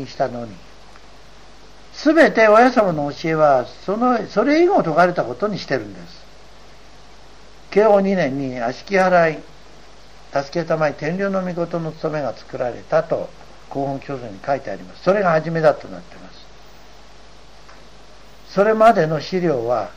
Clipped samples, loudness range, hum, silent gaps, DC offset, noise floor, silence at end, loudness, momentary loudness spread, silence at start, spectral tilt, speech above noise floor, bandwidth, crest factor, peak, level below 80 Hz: under 0.1%; 8 LU; none; none; 0.9%; -45 dBFS; 0.05 s; -18 LUFS; 15 LU; 0 s; -6.5 dB/octave; 27 dB; 9.8 kHz; 16 dB; -2 dBFS; -50 dBFS